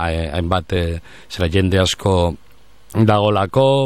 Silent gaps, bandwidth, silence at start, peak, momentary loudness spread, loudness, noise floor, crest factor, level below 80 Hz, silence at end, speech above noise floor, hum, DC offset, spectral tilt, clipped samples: none; 14.5 kHz; 0 s; -2 dBFS; 11 LU; -18 LUFS; -47 dBFS; 14 dB; -34 dBFS; 0 s; 31 dB; none; 0.9%; -6 dB/octave; under 0.1%